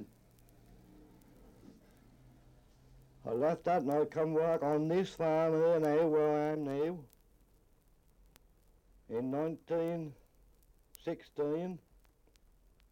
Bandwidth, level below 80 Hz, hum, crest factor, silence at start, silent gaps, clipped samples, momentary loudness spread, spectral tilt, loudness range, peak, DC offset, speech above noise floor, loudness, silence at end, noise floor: 16.5 kHz; -66 dBFS; none; 16 dB; 0 s; none; under 0.1%; 14 LU; -7.5 dB/octave; 10 LU; -22 dBFS; under 0.1%; 34 dB; -34 LUFS; 1.15 s; -67 dBFS